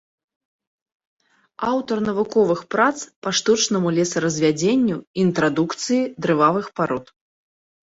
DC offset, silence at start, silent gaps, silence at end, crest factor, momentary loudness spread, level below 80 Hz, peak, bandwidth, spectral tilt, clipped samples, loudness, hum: under 0.1%; 1.6 s; 3.16-3.22 s, 5.07-5.14 s; 0.8 s; 18 dB; 6 LU; -60 dBFS; -2 dBFS; 8 kHz; -4.5 dB/octave; under 0.1%; -20 LUFS; none